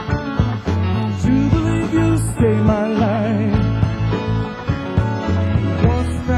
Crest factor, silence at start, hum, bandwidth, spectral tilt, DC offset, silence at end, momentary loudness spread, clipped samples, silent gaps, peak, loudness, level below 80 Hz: 16 dB; 0 s; none; 12.5 kHz; -7.5 dB/octave; under 0.1%; 0 s; 5 LU; under 0.1%; none; -2 dBFS; -18 LUFS; -26 dBFS